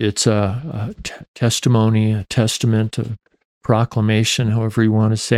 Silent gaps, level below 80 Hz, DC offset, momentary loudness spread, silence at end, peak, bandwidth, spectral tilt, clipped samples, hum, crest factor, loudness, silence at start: 1.28-1.34 s, 3.45-3.61 s; -48 dBFS; under 0.1%; 12 LU; 0 s; -2 dBFS; 14.5 kHz; -5.5 dB/octave; under 0.1%; none; 14 dB; -18 LUFS; 0 s